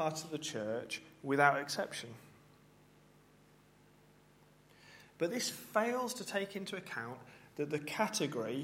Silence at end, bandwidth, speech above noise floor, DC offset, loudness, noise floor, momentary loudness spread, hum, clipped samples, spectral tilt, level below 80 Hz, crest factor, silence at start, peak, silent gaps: 0 s; 16.5 kHz; 28 dB; under 0.1%; -37 LUFS; -65 dBFS; 21 LU; 50 Hz at -70 dBFS; under 0.1%; -3.5 dB/octave; -78 dBFS; 26 dB; 0 s; -14 dBFS; none